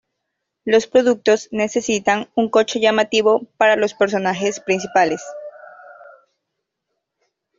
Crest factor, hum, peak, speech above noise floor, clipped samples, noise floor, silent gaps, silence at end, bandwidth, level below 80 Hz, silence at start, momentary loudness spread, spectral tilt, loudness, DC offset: 16 dB; none; -2 dBFS; 61 dB; under 0.1%; -78 dBFS; none; 1.65 s; 7.6 kHz; -62 dBFS; 0.65 s; 7 LU; -3.5 dB/octave; -18 LUFS; under 0.1%